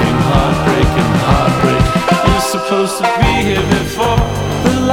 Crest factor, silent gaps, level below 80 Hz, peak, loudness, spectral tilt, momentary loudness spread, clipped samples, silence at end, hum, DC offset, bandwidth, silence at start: 12 dB; none; -24 dBFS; 0 dBFS; -13 LUFS; -5.5 dB/octave; 3 LU; under 0.1%; 0 s; none; under 0.1%; 18.5 kHz; 0 s